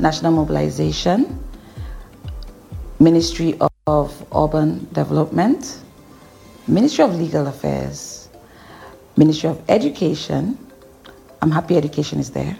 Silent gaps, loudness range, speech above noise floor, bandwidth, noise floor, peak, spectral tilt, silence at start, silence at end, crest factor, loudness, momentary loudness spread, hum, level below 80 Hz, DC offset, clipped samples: none; 3 LU; 27 dB; 16 kHz; -44 dBFS; -2 dBFS; -6.5 dB/octave; 0 s; 0 s; 18 dB; -18 LUFS; 20 LU; none; -38 dBFS; under 0.1%; under 0.1%